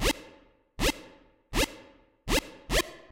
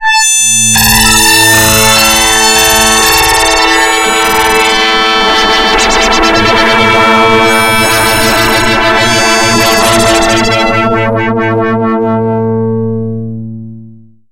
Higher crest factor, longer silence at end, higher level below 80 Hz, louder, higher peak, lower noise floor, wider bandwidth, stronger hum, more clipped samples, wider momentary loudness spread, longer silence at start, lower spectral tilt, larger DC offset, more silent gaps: first, 20 dB vs 8 dB; second, 0.15 s vs 0.35 s; second, -38 dBFS vs -26 dBFS; second, -30 LUFS vs -6 LUFS; second, -12 dBFS vs 0 dBFS; first, -58 dBFS vs -34 dBFS; second, 17 kHz vs over 20 kHz; neither; second, under 0.1% vs 1%; first, 13 LU vs 8 LU; about the same, 0 s vs 0 s; about the same, -3 dB/octave vs -2 dB/octave; neither; neither